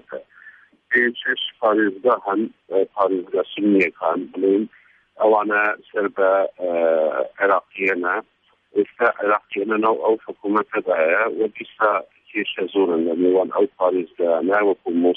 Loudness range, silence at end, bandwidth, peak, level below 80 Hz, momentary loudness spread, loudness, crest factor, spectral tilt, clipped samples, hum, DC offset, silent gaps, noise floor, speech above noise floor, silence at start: 1 LU; 0 s; 4.9 kHz; -4 dBFS; -72 dBFS; 6 LU; -20 LUFS; 16 dB; -7 dB/octave; under 0.1%; none; under 0.1%; none; -48 dBFS; 28 dB; 0.1 s